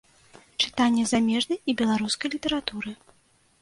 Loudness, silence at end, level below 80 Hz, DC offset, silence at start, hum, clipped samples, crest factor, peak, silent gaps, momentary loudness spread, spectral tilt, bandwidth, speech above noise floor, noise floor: -25 LUFS; 0.65 s; -58 dBFS; under 0.1%; 0.6 s; none; under 0.1%; 20 dB; -8 dBFS; none; 12 LU; -3.5 dB/octave; 11.5 kHz; 38 dB; -63 dBFS